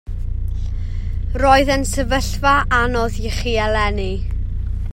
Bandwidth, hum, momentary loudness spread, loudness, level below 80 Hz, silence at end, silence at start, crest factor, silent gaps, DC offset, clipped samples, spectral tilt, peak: 16.5 kHz; none; 12 LU; -19 LUFS; -22 dBFS; 0 s; 0.05 s; 18 dB; none; under 0.1%; under 0.1%; -5 dB/octave; 0 dBFS